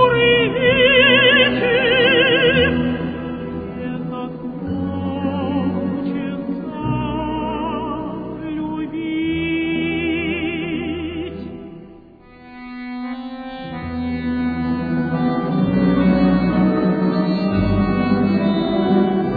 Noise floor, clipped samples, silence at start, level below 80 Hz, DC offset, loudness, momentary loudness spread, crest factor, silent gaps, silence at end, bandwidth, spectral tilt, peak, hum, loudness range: -43 dBFS; under 0.1%; 0 s; -40 dBFS; under 0.1%; -18 LUFS; 15 LU; 16 dB; none; 0 s; 4.9 kHz; -9 dB/octave; -2 dBFS; none; 12 LU